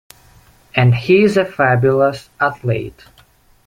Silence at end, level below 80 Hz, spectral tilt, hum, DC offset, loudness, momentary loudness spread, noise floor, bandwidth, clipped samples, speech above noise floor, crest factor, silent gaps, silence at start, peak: 0.75 s; -48 dBFS; -7.5 dB/octave; none; under 0.1%; -15 LUFS; 10 LU; -51 dBFS; 11.5 kHz; under 0.1%; 36 dB; 16 dB; none; 0.75 s; -2 dBFS